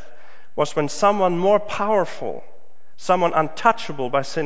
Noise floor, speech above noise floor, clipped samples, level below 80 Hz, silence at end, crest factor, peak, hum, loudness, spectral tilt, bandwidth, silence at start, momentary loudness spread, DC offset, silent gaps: -50 dBFS; 30 dB; under 0.1%; -66 dBFS; 0 s; 20 dB; -2 dBFS; none; -21 LUFS; -5 dB/octave; 8 kHz; 0.55 s; 13 LU; 4%; none